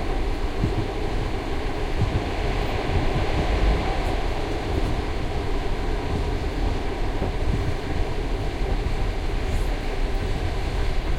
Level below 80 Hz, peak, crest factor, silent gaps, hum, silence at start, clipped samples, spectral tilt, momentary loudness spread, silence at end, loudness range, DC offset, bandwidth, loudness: -26 dBFS; -8 dBFS; 14 dB; none; none; 0 s; under 0.1%; -6.5 dB/octave; 4 LU; 0 s; 2 LU; under 0.1%; 12 kHz; -27 LUFS